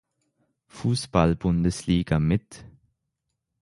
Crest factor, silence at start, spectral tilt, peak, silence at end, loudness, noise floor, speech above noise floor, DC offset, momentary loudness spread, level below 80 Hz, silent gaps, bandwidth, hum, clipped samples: 22 dB; 0.75 s; -6.5 dB/octave; -4 dBFS; 0.95 s; -24 LUFS; -80 dBFS; 57 dB; under 0.1%; 5 LU; -40 dBFS; none; 11.5 kHz; none; under 0.1%